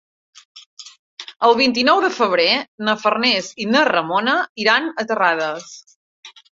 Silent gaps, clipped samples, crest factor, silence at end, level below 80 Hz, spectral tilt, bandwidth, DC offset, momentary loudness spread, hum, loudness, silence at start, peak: 0.66-0.77 s, 0.99-1.17 s, 2.68-2.78 s, 4.49-4.55 s, 5.96-6.23 s; under 0.1%; 18 dB; 0.25 s; -66 dBFS; -3 dB/octave; 7.8 kHz; under 0.1%; 17 LU; none; -17 LUFS; 0.55 s; -2 dBFS